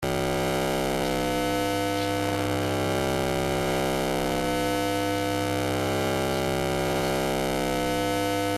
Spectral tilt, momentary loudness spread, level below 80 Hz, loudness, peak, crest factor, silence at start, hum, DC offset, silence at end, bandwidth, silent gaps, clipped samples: -4.5 dB/octave; 1 LU; -44 dBFS; -26 LUFS; -12 dBFS; 14 dB; 0 s; none; under 0.1%; 0 s; 15.5 kHz; none; under 0.1%